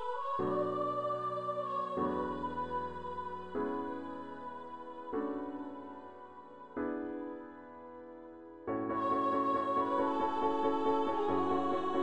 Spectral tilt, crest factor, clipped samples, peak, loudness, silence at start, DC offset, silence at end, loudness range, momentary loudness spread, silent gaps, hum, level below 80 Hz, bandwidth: -7.5 dB/octave; 18 dB; under 0.1%; -18 dBFS; -36 LUFS; 0 s; under 0.1%; 0 s; 10 LU; 18 LU; none; none; -66 dBFS; 9.4 kHz